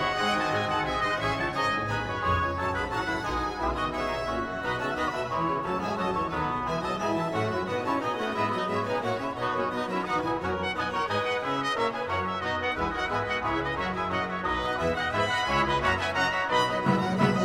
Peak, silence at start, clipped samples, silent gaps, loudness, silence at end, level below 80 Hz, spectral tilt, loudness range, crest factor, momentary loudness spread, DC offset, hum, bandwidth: -10 dBFS; 0 s; under 0.1%; none; -28 LUFS; 0 s; -46 dBFS; -5 dB/octave; 3 LU; 18 dB; 4 LU; under 0.1%; none; 17 kHz